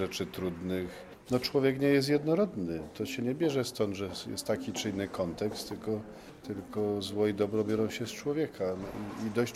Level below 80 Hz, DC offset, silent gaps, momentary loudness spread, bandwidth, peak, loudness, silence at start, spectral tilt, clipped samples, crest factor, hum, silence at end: -60 dBFS; under 0.1%; none; 10 LU; 15.5 kHz; -14 dBFS; -32 LUFS; 0 s; -5.5 dB/octave; under 0.1%; 18 dB; none; 0 s